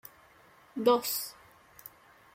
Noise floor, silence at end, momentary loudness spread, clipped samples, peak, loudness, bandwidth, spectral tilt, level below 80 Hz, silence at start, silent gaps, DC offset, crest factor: -60 dBFS; 1 s; 24 LU; under 0.1%; -12 dBFS; -29 LUFS; 16.5 kHz; -3 dB/octave; -74 dBFS; 0.75 s; none; under 0.1%; 22 dB